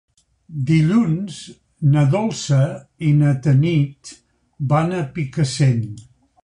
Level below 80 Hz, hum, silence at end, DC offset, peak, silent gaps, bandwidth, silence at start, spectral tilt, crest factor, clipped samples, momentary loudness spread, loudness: -50 dBFS; none; 0.4 s; under 0.1%; -4 dBFS; none; 10.5 kHz; 0.5 s; -7 dB/octave; 14 dB; under 0.1%; 16 LU; -19 LUFS